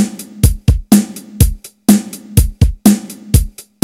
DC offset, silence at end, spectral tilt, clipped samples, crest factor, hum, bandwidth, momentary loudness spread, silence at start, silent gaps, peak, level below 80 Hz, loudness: under 0.1%; 0.2 s; -6 dB/octave; 1%; 12 dB; none; over 20 kHz; 6 LU; 0 s; none; 0 dBFS; -18 dBFS; -14 LUFS